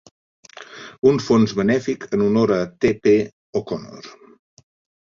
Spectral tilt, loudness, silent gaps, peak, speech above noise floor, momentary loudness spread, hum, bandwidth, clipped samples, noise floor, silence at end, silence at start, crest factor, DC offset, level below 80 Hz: -6.5 dB/octave; -19 LUFS; 3.33-3.53 s; -2 dBFS; 21 dB; 21 LU; none; 7.4 kHz; under 0.1%; -40 dBFS; 0.95 s; 0.6 s; 18 dB; under 0.1%; -54 dBFS